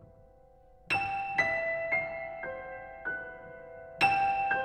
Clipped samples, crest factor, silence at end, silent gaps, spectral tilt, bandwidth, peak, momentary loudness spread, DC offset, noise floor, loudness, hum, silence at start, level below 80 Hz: under 0.1%; 20 dB; 0 s; none; -4 dB/octave; 12.5 kHz; -12 dBFS; 19 LU; under 0.1%; -58 dBFS; -31 LUFS; none; 0 s; -60 dBFS